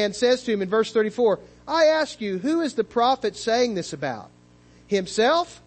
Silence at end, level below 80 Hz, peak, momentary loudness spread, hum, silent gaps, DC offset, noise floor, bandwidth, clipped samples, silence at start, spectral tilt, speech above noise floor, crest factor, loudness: 0.1 s; -60 dBFS; -8 dBFS; 9 LU; 60 Hz at -50 dBFS; none; under 0.1%; -53 dBFS; 8.8 kHz; under 0.1%; 0 s; -4 dB/octave; 30 dB; 14 dB; -23 LUFS